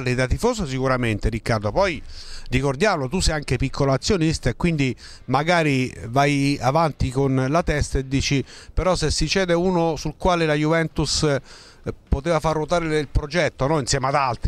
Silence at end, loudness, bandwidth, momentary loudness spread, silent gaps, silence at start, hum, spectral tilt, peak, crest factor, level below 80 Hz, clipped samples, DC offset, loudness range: 0 s; -21 LUFS; 13.5 kHz; 6 LU; none; 0 s; none; -5 dB/octave; -4 dBFS; 16 dB; -32 dBFS; under 0.1%; under 0.1%; 2 LU